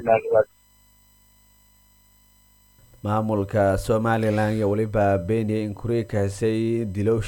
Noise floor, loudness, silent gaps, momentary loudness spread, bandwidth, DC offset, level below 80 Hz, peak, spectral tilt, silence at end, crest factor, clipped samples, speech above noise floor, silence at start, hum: -57 dBFS; -23 LUFS; none; 5 LU; 17 kHz; under 0.1%; -46 dBFS; -6 dBFS; -7.5 dB/octave; 0 s; 18 dB; under 0.1%; 35 dB; 0 s; 50 Hz at -45 dBFS